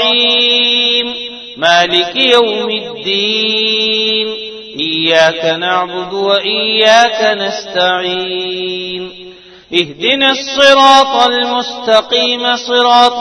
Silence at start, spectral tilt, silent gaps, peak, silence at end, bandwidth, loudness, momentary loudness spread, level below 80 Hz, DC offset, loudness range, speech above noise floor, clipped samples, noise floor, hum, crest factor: 0 s; -2.5 dB/octave; none; 0 dBFS; 0 s; 11 kHz; -11 LUFS; 11 LU; -54 dBFS; under 0.1%; 3 LU; 24 dB; 0.5%; -35 dBFS; none; 12 dB